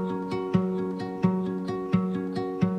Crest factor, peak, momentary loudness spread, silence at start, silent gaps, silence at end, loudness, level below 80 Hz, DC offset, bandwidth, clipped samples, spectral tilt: 18 dB; -10 dBFS; 4 LU; 0 s; none; 0 s; -28 LUFS; -58 dBFS; under 0.1%; 6.2 kHz; under 0.1%; -9 dB/octave